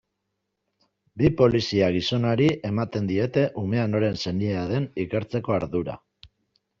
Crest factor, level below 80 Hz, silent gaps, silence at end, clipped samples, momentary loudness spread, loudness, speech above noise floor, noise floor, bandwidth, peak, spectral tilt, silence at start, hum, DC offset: 18 dB; -52 dBFS; none; 0.55 s; under 0.1%; 8 LU; -24 LUFS; 56 dB; -79 dBFS; 7.6 kHz; -6 dBFS; -7 dB/octave; 1.15 s; none; under 0.1%